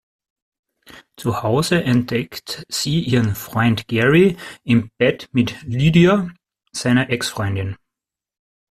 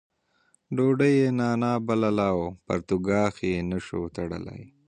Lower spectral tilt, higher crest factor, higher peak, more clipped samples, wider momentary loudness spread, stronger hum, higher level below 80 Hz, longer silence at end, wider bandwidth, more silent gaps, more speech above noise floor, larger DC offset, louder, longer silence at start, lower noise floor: second, -6 dB/octave vs -7.5 dB/octave; about the same, 18 dB vs 18 dB; first, -2 dBFS vs -8 dBFS; neither; about the same, 13 LU vs 12 LU; neither; about the same, -48 dBFS vs -50 dBFS; first, 1 s vs 0.2 s; first, 14.5 kHz vs 9.6 kHz; neither; first, 68 dB vs 42 dB; neither; first, -18 LUFS vs -26 LUFS; first, 0.95 s vs 0.7 s; first, -85 dBFS vs -67 dBFS